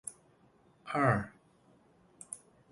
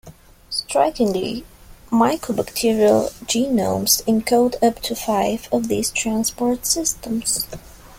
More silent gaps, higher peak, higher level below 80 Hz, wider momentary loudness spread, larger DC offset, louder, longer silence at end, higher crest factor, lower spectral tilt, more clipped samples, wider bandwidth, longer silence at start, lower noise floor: neither; second, -14 dBFS vs -2 dBFS; second, -64 dBFS vs -46 dBFS; first, 23 LU vs 8 LU; neither; second, -34 LUFS vs -20 LUFS; first, 0.35 s vs 0 s; first, 24 dB vs 18 dB; first, -6 dB/octave vs -3.5 dB/octave; neither; second, 11.5 kHz vs 17 kHz; about the same, 0.05 s vs 0.05 s; first, -66 dBFS vs -41 dBFS